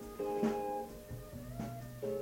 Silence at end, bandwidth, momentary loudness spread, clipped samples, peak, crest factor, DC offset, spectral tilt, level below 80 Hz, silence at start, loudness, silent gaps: 0 s; 17 kHz; 12 LU; under 0.1%; -22 dBFS; 18 dB; under 0.1%; -7 dB/octave; -58 dBFS; 0 s; -40 LUFS; none